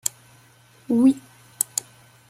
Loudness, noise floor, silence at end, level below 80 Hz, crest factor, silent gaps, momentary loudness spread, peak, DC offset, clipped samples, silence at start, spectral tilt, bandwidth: -23 LUFS; -54 dBFS; 1.1 s; -68 dBFS; 26 dB; none; 11 LU; 0 dBFS; under 0.1%; under 0.1%; 0.05 s; -3.5 dB/octave; 16.5 kHz